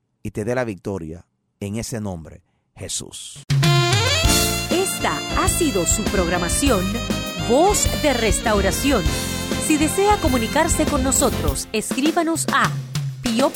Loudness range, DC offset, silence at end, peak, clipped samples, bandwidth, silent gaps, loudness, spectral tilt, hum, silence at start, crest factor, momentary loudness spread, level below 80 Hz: 5 LU; under 0.1%; 0 s; -4 dBFS; under 0.1%; 18 kHz; none; -19 LUFS; -4 dB/octave; none; 0.25 s; 16 dB; 12 LU; -32 dBFS